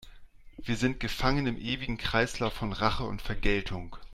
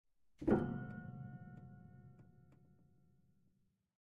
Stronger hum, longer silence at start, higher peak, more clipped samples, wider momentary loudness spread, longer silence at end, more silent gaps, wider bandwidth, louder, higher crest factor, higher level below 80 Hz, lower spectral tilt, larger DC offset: neither; second, 0 s vs 0.4 s; first, -10 dBFS vs -20 dBFS; neither; second, 7 LU vs 24 LU; second, 0 s vs 1.9 s; neither; first, 14 kHz vs 6.8 kHz; first, -31 LUFS vs -41 LUFS; about the same, 20 dB vs 24 dB; first, -38 dBFS vs -64 dBFS; second, -5 dB/octave vs -10 dB/octave; neither